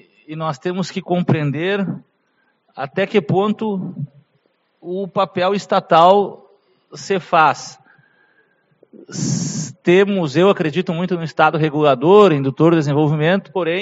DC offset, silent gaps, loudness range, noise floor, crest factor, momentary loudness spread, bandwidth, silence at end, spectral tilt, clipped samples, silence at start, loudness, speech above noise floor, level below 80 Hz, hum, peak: under 0.1%; none; 7 LU; -64 dBFS; 18 dB; 16 LU; 8 kHz; 0 s; -5.5 dB/octave; under 0.1%; 0.3 s; -17 LUFS; 47 dB; -62 dBFS; none; 0 dBFS